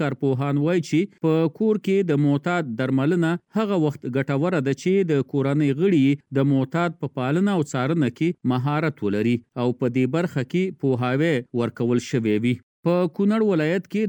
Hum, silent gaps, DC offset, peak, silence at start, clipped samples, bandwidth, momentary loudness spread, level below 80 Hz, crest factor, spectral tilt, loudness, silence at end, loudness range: none; 12.63-12.83 s; under 0.1%; -8 dBFS; 0 s; under 0.1%; 18.5 kHz; 4 LU; -68 dBFS; 14 dB; -7.5 dB/octave; -22 LUFS; 0 s; 2 LU